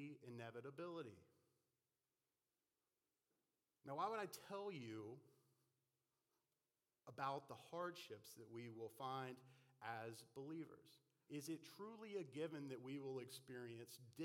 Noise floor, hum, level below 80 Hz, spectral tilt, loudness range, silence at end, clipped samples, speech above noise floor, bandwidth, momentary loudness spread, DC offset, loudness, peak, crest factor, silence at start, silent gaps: under -90 dBFS; none; under -90 dBFS; -5 dB/octave; 4 LU; 0 s; under 0.1%; over 37 dB; 16 kHz; 11 LU; under 0.1%; -53 LUFS; -32 dBFS; 22 dB; 0 s; none